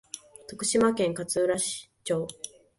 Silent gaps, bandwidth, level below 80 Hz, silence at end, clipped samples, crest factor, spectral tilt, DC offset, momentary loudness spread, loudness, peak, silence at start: none; 12 kHz; -64 dBFS; 0.3 s; under 0.1%; 18 dB; -3.5 dB/octave; under 0.1%; 18 LU; -27 LUFS; -10 dBFS; 0.15 s